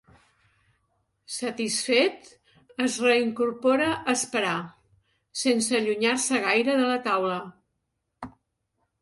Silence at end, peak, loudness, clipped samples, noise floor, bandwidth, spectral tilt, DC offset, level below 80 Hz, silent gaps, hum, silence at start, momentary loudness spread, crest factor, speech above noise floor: 0.7 s; -8 dBFS; -24 LUFS; under 0.1%; -79 dBFS; 11.5 kHz; -2.5 dB/octave; under 0.1%; -68 dBFS; none; none; 1.3 s; 18 LU; 18 dB; 54 dB